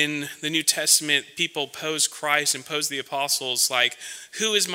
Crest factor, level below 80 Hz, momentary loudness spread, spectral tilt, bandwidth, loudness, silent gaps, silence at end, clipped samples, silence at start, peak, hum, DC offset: 20 dB; -78 dBFS; 9 LU; -0.5 dB/octave; 16.5 kHz; -22 LUFS; none; 0 s; under 0.1%; 0 s; -4 dBFS; none; under 0.1%